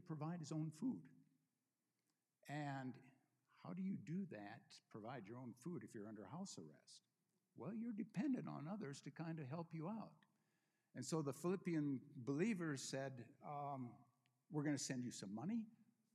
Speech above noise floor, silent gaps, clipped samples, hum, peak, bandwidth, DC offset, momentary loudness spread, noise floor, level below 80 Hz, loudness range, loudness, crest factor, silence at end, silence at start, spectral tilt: over 42 dB; none; under 0.1%; none; -30 dBFS; 13.5 kHz; under 0.1%; 14 LU; under -90 dBFS; under -90 dBFS; 7 LU; -49 LUFS; 20 dB; 0.3 s; 0 s; -6 dB/octave